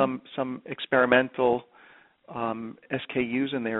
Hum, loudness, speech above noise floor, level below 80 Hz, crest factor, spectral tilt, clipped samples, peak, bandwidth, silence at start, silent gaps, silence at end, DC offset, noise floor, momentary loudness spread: none; -27 LUFS; 29 dB; -64 dBFS; 22 dB; -3.5 dB/octave; under 0.1%; -6 dBFS; 4.1 kHz; 0 s; none; 0 s; under 0.1%; -56 dBFS; 13 LU